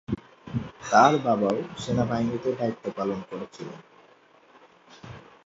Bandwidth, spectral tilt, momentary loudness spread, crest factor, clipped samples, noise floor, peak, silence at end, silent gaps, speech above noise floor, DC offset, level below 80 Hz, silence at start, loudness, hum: 7.8 kHz; -6 dB/octave; 22 LU; 22 dB; under 0.1%; -57 dBFS; -4 dBFS; 0.25 s; none; 32 dB; under 0.1%; -56 dBFS; 0.1 s; -26 LUFS; none